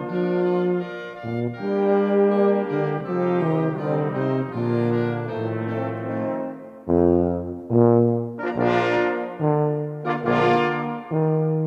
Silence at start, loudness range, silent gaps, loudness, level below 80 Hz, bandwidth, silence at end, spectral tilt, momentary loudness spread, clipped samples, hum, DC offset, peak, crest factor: 0 s; 3 LU; none; -22 LUFS; -54 dBFS; 6.8 kHz; 0 s; -9 dB/octave; 9 LU; under 0.1%; none; under 0.1%; -6 dBFS; 16 dB